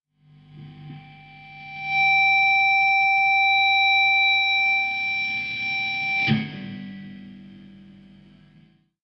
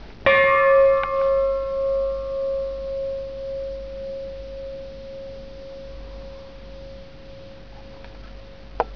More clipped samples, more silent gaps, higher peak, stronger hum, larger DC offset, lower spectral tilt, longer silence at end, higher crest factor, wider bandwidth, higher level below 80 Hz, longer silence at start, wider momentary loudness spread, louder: neither; neither; second, -8 dBFS vs -2 dBFS; first, 50 Hz at -55 dBFS vs none; second, under 0.1% vs 0.5%; about the same, -5 dB/octave vs -6 dB/octave; first, 1.45 s vs 0 s; second, 14 dB vs 22 dB; first, 6.6 kHz vs 5.4 kHz; second, -64 dBFS vs -42 dBFS; first, 0.55 s vs 0 s; second, 19 LU vs 27 LU; first, -18 LUFS vs -21 LUFS